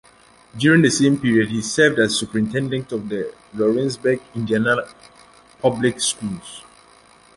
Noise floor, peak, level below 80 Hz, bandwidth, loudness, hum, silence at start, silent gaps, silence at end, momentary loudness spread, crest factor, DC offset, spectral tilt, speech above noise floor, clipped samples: -51 dBFS; -2 dBFS; -54 dBFS; 11.5 kHz; -19 LUFS; none; 0.55 s; none; 0.75 s; 13 LU; 20 dB; under 0.1%; -4.5 dB/octave; 31 dB; under 0.1%